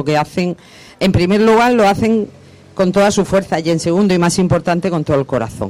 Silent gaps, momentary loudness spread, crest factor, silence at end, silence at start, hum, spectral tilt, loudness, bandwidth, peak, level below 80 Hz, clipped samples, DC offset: none; 9 LU; 10 dB; 0 s; 0 s; none; -6 dB/octave; -14 LUFS; 15.5 kHz; -4 dBFS; -40 dBFS; under 0.1%; under 0.1%